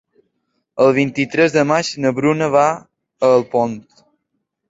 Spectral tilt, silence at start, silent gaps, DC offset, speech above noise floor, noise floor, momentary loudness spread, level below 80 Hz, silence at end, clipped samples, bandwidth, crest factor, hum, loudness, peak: -5.5 dB/octave; 0.75 s; none; under 0.1%; 58 dB; -73 dBFS; 8 LU; -60 dBFS; 0.9 s; under 0.1%; 8 kHz; 16 dB; none; -16 LUFS; -2 dBFS